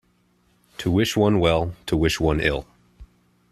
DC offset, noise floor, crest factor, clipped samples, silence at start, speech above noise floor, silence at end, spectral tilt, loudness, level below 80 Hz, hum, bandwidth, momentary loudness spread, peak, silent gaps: under 0.1%; -63 dBFS; 18 dB; under 0.1%; 0.8 s; 43 dB; 0.5 s; -5.5 dB/octave; -22 LUFS; -38 dBFS; 60 Hz at -50 dBFS; 14 kHz; 10 LU; -4 dBFS; none